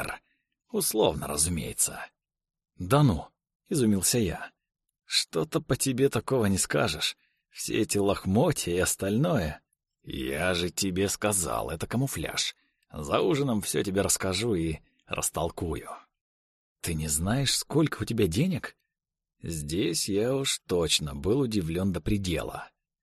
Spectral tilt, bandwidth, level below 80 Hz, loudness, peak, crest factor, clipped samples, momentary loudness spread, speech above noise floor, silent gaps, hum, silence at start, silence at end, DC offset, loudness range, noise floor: -4 dB/octave; 13 kHz; -48 dBFS; -27 LUFS; -10 dBFS; 18 dB; under 0.1%; 12 LU; 48 dB; 3.55-3.60 s, 16.21-16.76 s; none; 0 s; 0.35 s; under 0.1%; 2 LU; -75 dBFS